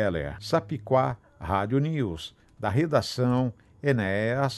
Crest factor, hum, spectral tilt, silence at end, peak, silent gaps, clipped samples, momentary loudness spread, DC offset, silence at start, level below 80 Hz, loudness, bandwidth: 18 dB; none; -7 dB/octave; 0 s; -8 dBFS; none; under 0.1%; 8 LU; under 0.1%; 0 s; -48 dBFS; -27 LUFS; 12.5 kHz